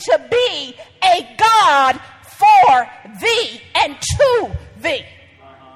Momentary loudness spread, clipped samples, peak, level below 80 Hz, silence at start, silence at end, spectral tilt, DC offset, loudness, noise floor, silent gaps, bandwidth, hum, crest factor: 15 LU; under 0.1%; -2 dBFS; -42 dBFS; 0 s; 0.75 s; -2.5 dB/octave; under 0.1%; -14 LUFS; -44 dBFS; none; 15.5 kHz; none; 14 dB